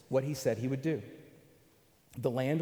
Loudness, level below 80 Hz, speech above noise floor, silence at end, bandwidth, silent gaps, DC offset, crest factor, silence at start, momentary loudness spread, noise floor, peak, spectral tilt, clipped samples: -34 LUFS; -70 dBFS; 33 dB; 0 s; over 20 kHz; none; under 0.1%; 20 dB; 0.1 s; 19 LU; -65 dBFS; -16 dBFS; -6.5 dB/octave; under 0.1%